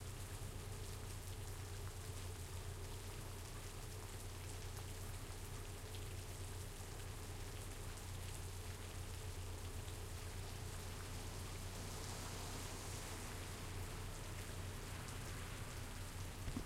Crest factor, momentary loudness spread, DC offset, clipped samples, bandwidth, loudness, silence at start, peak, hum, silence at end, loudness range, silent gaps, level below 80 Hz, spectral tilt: 16 dB; 3 LU; under 0.1%; under 0.1%; 16 kHz; -50 LUFS; 0 s; -32 dBFS; none; 0 s; 2 LU; none; -54 dBFS; -4 dB/octave